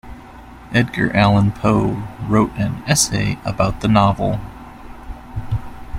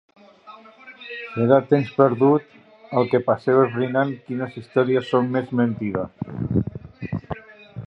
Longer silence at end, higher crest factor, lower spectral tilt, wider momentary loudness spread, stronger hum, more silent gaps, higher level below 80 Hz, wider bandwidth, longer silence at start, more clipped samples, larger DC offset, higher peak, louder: about the same, 0 s vs 0 s; about the same, 18 dB vs 20 dB; second, -5 dB/octave vs -9.5 dB/octave; first, 22 LU vs 16 LU; neither; neither; first, -36 dBFS vs -50 dBFS; first, 16 kHz vs 5.8 kHz; second, 0.05 s vs 0.45 s; neither; neither; about the same, -2 dBFS vs -2 dBFS; first, -18 LUFS vs -21 LUFS